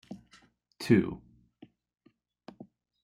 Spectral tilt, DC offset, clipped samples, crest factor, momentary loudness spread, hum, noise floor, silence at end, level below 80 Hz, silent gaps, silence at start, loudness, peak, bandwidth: -7 dB/octave; under 0.1%; under 0.1%; 24 dB; 26 LU; none; -63 dBFS; 0.4 s; -64 dBFS; none; 0.1 s; -28 LUFS; -10 dBFS; 13.5 kHz